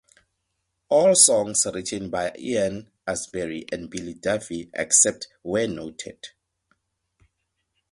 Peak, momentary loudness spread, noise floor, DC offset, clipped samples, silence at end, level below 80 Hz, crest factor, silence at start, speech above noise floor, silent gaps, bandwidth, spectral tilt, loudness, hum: -2 dBFS; 19 LU; -77 dBFS; under 0.1%; under 0.1%; 1.65 s; -58 dBFS; 24 dB; 0.9 s; 53 dB; none; 11.5 kHz; -2 dB/octave; -22 LUFS; none